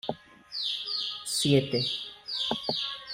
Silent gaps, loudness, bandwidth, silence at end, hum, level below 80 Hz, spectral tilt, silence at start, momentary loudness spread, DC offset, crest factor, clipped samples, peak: none; -29 LUFS; 16 kHz; 0 s; none; -66 dBFS; -4 dB/octave; 0.05 s; 12 LU; under 0.1%; 20 dB; under 0.1%; -12 dBFS